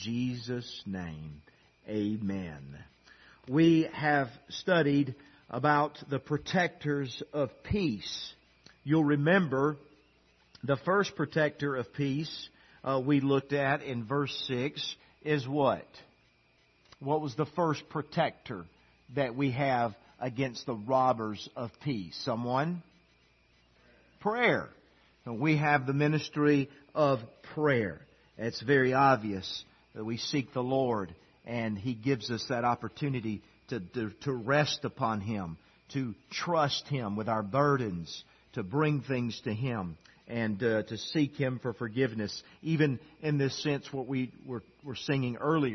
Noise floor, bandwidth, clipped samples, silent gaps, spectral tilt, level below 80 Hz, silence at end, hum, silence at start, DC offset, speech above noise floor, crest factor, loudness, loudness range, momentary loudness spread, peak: -67 dBFS; 6.4 kHz; under 0.1%; none; -6.5 dB/octave; -64 dBFS; 0 s; none; 0 s; under 0.1%; 36 dB; 20 dB; -31 LUFS; 4 LU; 14 LU; -10 dBFS